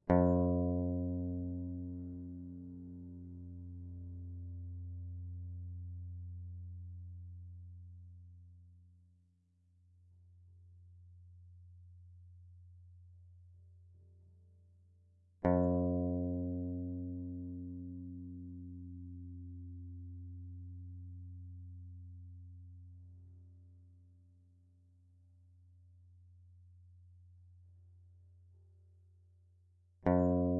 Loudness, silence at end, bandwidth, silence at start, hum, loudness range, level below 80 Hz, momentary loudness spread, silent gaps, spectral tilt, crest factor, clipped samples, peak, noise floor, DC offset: -40 LUFS; 0 s; 2.1 kHz; 0.05 s; 50 Hz at -95 dBFS; 25 LU; -64 dBFS; 28 LU; none; -8.5 dB/octave; 26 dB; under 0.1%; -14 dBFS; -72 dBFS; under 0.1%